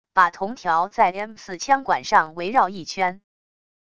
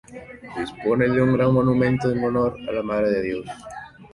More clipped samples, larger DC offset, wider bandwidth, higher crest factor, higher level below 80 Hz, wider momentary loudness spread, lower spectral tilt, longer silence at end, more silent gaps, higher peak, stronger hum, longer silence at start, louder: neither; first, 0.4% vs under 0.1%; second, 10 kHz vs 11.5 kHz; about the same, 20 dB vs 16 dB; second, -60 dBFS vs -48 dBFS; second, 9 LU vs 19 LU; second, -3.5 dB/octave vs -8.5 dB/octave; first, 0.75 s vs 0.1 s; neither; first, -2 dBFS vs -6 dBFS; neither; about the same, 0.15 s vs 0.1 s; about the same, -21 LUFS vs -22 LUFS